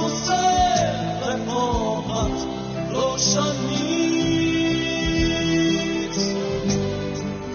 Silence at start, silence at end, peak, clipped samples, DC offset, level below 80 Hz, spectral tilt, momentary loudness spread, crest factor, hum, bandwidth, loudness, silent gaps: 0 s; 0 s; -6 dBFS; under 0.1%; under 0.1%; -38 dBFS; -4 dB/octave; 7 LU; 16 dB; none; 6.8 kHz; -22 LUFS; none